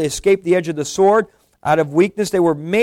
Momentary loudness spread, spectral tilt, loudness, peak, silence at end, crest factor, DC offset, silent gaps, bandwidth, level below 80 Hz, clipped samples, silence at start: 7 LU; -5.5 dB/octave; -17 LUFS; -4 dBFS; 0 s; 12 dB; under 0.1%; none; 15.5 kHz; -48 dBFS; under 0.1%; 0 s